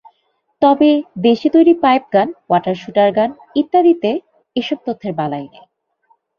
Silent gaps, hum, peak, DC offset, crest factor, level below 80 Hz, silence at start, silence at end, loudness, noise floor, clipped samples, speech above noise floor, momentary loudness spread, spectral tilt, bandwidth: none; none; -2 dBFS; under 0.1%; 14 dB; -60 dBFS; 0.6 s; 0.9 s; -15 LUFS; -66 dBFS; under 0.1%; 51 dB; 12 LU; -7.5 dB/octave; 6.6 kHz